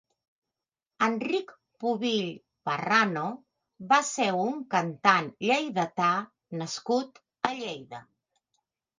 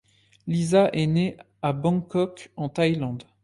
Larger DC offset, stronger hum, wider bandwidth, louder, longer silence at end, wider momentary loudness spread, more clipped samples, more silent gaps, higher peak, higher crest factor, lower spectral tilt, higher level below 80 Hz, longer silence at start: neither; neither; second, 10 kHz vs 11.5 kHz; second, -28 LUFS vs -25 LUFS; first, 0.95 s vs 0.2 s; first, 16 LU vs 11 LU; neither; neither; about the same, -6 dBFS vs -8 dBFS; first, 24 dB vs 16 dB; second, -4 dB/octave vs -7 dB/octave; second, -78 dBFS vs -58 dBFS; first, 1 s vs 0.45 s